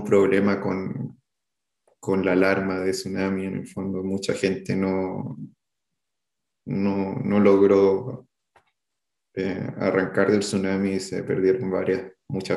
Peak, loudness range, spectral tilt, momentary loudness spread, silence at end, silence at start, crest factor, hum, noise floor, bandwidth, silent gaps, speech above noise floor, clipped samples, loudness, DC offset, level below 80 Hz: -4 dBFS; 5 LU; -6.5 dB/octave; 14 LU; 0 s; 0 s; 20 dB; none; -85 dBFS; 12 kHz; none; 62 dB; under 0.1%; -23 LUFS; under 0.1%; -66 dBFS